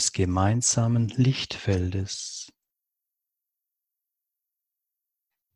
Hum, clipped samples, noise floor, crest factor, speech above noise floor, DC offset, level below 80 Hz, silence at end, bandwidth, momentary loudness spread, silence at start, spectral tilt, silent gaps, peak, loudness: none; under 0.1%; -85 dBFS; 20 dB; 61 dB; under 0.1%; -44 dBFS; 3.1 s; 12 kHz; 12 LU; 0 s; -4.5 dB/octave; none; -8 dBFS; -25 LUFS